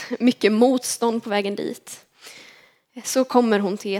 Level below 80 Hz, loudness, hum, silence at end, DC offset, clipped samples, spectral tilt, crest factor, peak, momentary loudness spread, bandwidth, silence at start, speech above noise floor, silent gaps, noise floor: -78 dBFS; -21 LUFS; none; 0 s; under 0.1%; under 0.1%; -4 dB/octave; 20 dB; -2 dBFS; 21 LU; 16.5 kHz; 0 s; 32 dB; none; -52 dBFS